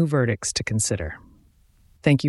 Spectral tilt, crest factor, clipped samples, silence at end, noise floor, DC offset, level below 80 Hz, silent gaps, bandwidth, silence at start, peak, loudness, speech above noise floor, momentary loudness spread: -5 dB/octave; 20 dB; under 0.1%; 0 s; -57 dBFS; under 0.1%; -46 dBFS; none; 12 kHz; 0 s; -4 dBFS; -24 LUFS; 34 dB; 12 LU